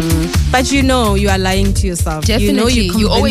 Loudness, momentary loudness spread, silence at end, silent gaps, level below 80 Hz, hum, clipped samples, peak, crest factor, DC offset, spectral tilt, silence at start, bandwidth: -13 LUFS; 3 LU; 0 s; none; -20 dBFS; none; under 0.1%; -2 dBFS; 12 dB; under 0.1%; -5 dB/octave; 0 s; 15.5 kHz